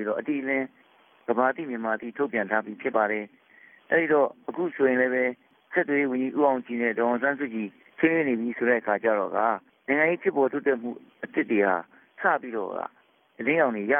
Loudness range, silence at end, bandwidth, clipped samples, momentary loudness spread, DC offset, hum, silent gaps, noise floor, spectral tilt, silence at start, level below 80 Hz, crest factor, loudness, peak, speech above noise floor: 3 LU; 0 s; 3.6 kHz; under 0.1%; 9 LU; under 0.1%; none; none; -55 dBFS; -10 dB/octave; 0 s; -76 dBFS; 18 dB; -26 LUFS; -8 dBFS; 30 dB